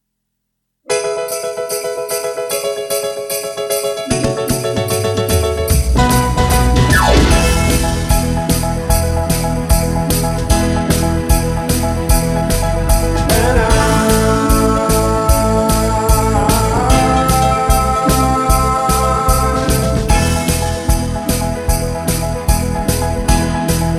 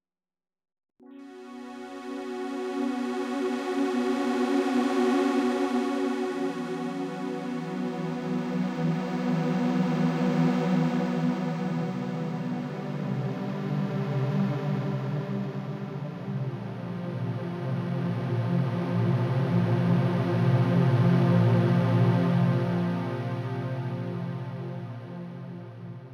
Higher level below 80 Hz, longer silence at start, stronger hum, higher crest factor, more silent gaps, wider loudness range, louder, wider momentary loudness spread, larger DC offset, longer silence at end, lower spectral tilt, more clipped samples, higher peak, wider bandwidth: first, -18 dBFS vs -66 dBFS; second, 0.9 s vs 1.1 s; neither; about the same, 14 dB vs 16 dB; neither; second, 5 LU vs 9 LU; first, -15 LUFS vs -28 LUFS; second, 6 LU vs 12 LU; neither; about the same, 0 s vs 0 s; second, -5 dB/octave vs -8 dB/octave; neither; first, 0 dBFS vs -12 dBFS; first, 15 kHz vs 11 kHz